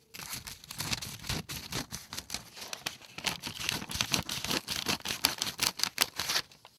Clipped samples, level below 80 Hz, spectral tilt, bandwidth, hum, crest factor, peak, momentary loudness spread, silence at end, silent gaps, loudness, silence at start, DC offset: under 0.1%; -56 dBFS; -1.5 dB/octave; 18 kHz; none; 32 dB; -4 dBFS; 11 LU; 0.2 s; none; -33 LUFS; 0.15 s; under 0.1%